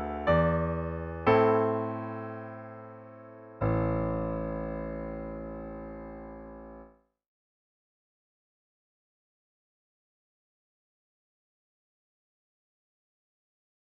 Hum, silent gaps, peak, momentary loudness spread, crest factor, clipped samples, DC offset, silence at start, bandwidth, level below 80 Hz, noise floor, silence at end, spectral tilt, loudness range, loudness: none; none; -10 dBFS; 21 LU; 24 dB; under 0.1%; under 0.1%; 0 s; 5.6 kHz; -48 dBFS; -55 dBFS; 7.1 s; -9.5 dB/octave; 19 LU; -30 LUFS